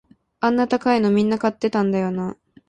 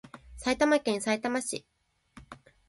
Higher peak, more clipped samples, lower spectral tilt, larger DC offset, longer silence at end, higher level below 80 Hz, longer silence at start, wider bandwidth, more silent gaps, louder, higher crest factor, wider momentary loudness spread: first, -6 dBFS vs -10 dBFS; neither; first, -7 dB/octave vs -3 dB/octave; neither; about the same, 0.35 s vs 0.35 s; about the same, -58 dBFS vs -58 dBFS; first, 0.4 s vs 0.05 s; second, 9.2 kHz vs 11.5 kHz; neither; first, -20 LUFS vs -29 LUFS; second, 14 dB vs 20 dB; second, 7 LU vs 18 LU